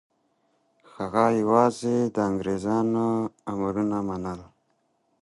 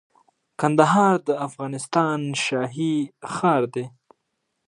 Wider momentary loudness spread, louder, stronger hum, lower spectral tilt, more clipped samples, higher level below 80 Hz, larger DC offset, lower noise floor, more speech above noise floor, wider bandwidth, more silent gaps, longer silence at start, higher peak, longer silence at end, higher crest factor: about the same, 11 LU vs 13 LU; second, -25 LUFS vs -22 LUFS; neither; first, -7 dB/octave vs -5.5 dB/octave; neither; first, -58 dBFS vs -70 dBFS; neither; second, -71 dBFS vs -76 dBFS; second, 46 dB vs 55 dB; about the same, 11.5 kHz vs 11.5 kHz; neither; first, 1 s vs 0.6 s; about the same, -4 dBFS vs -2 dBFS; about the same, 0.75 s vs 0.8 s; about the same, 22 dB vs 22 dB